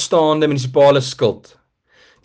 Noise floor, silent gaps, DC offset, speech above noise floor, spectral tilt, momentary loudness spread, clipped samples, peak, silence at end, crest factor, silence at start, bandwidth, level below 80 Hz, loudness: -54 dBFS; none; under 0.1%; 39 dB; -5.5 dB/octave; 7 LU; under 0.1%; -4 dBFS; 0.85 s; 14 dB; 0 s; 9.6 kHz; -58 dBFS; -15 LUFS